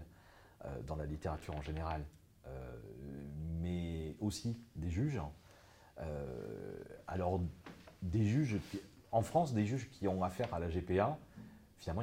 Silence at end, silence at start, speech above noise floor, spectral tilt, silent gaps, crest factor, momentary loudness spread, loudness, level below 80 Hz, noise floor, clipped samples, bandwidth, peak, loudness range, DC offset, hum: 0 s; 0 s; 24 dB; -7 dB/octave; none; 22 dB; 17 LU; -40 LUFS; -56 dBFS; -62 dBFS; under 0.1%; 16.5 kHz; -18 dBFS; 7 LU; under 0.1%; none